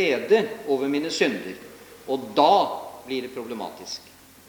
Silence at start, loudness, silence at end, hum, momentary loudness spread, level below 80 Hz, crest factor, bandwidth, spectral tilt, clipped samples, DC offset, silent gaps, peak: 0 s; -24 LUFS; 0.45 s; none; 18 LU; -68 dBFS; 22 dB; over 20 kHz; -4 dB/octave; under 0.1%; under 0.1%; none; -4 dBFS